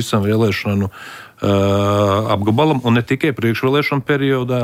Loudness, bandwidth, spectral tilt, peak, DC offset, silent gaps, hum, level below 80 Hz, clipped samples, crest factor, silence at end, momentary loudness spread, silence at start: -16 LUFS; 16 kHz; -6.5 dB/octave; -4 dBFS; under 0.1%; none; none; -52 dBFS; under 0.1%; 12 dB; 0 s; 6 LU; 0 s